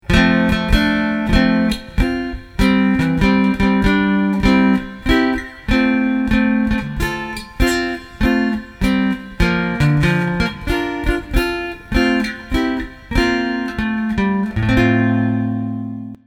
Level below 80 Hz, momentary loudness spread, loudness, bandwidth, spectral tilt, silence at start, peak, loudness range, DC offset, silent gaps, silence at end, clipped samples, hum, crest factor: -26 dBFS; 7 LU; -17 LUFS; 16.5 kHz; -6.5 dB/octave; 0.1 s; 0 dBFS; 4 LU; under 0.1%; none; 0.1 s; under 0.1%; none; 16 dB